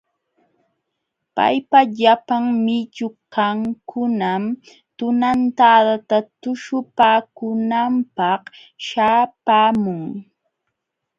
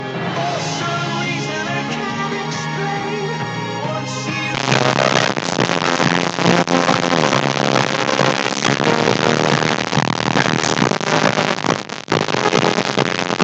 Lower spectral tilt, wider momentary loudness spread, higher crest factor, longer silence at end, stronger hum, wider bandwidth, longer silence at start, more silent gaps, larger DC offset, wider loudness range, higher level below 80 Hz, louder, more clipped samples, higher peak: first, -6 dB/octave vs -4 dB/octave; first, 13 LU vs 7 LU; about the same, 18 dB vs 18 dB; first, 0.95 s vs 0 s; neither; second, 7.6 kHz vs 9.2 kHz; first, 1.35 s vs 0 s; neither; neither; second, 3 LU vs 6 LU; second, -62 dBFS vs -54 dBFS; about the same, -18 LUFS vs -17 LUFS; neither; about the same, 0 dBFS vs 0 dBFS